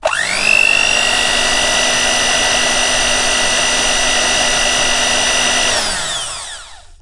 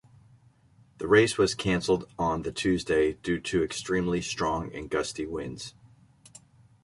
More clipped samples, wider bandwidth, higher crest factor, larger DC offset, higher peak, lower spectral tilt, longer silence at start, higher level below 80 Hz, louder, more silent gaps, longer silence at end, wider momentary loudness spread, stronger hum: neither; about the same, 12 kHz vs 11.5 kHz; second, 14 dB vs 22 dB; neither; first, 0 dBFS vs -8 dBFS; second, 0 dB/octave vs -5 dB/octave; second, 0 s vs 1 s; first, -32 dBFS vs -50 dBFS; first, -12 LUFS vs -27 LUFS; neither; second, 0.05 s vs 1.15 s; second, 7 LU vs 12 LU; neither